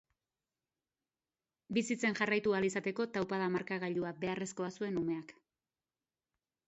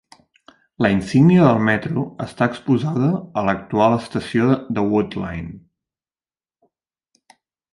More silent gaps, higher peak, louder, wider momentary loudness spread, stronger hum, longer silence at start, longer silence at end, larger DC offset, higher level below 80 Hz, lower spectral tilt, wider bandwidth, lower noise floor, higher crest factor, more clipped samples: neither; second, -16 dBFS vs -2 dBFS; second, -36 LUFS vs -19 LUFS; second, 8 LU vs 12 LU; neither; first, 1.7 s vs 0.8 s; second, 1.35 s vs 2.15 s; neither; second, -74 dBFS vs -50 dBFS; second, -4.5 dB/octave vs -8 dB/octave; second, 8 kHz vs 11.5 kHz; about the same, under -90 dBFS vs under -90 dBFS; about the same, 22 dB vs 18 dB; neither